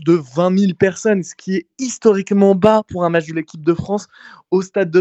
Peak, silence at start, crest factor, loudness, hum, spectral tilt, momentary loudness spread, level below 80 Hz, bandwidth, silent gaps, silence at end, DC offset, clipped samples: 0 dBFS; 0 s; 16 dB; -17 LUFS; none; -6.5 dB/octave; 10 LU; -54 dBFS; 8.4 kHz; none; 0 s; under 0.1%; under 0.1%